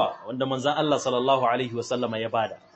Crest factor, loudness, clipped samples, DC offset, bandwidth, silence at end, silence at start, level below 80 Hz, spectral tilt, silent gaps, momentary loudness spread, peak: 16 dB; -25 LUFS; under 0.1%; under 0.1%; 8.6 kHz; 0.2 s; 0 s; -68 dBFS; -5 dB/octave; none; 6 LU; -10 dBFS